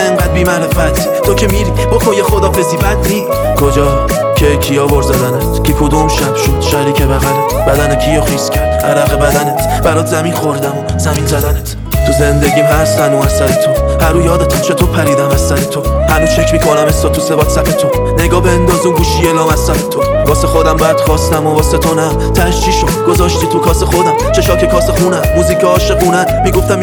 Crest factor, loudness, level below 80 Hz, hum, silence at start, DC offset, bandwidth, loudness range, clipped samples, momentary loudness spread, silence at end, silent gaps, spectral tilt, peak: 10 dB; -10 LUFS; -18 dBFS; none; 0 s; under 0.1%; over 20 kHz; 1 LU; 0.1%; 3 LU; 0 s; none; -5 dB/octave; 0 dBFS